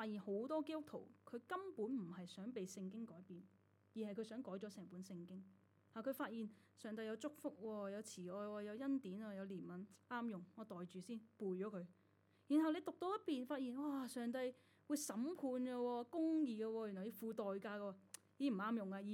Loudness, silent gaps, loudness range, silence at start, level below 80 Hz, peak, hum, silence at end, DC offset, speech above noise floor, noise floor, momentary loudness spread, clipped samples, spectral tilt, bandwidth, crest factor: -47 LUFS; none; 7 LU; 0 s; under -90 dBFS; -28 dBFS; none; 0 s; under 0.1%; 30 dB; -76 dBFS; 12 LU; under 0.1%; -5.5 dB/octave; 17 kHz; 18 dB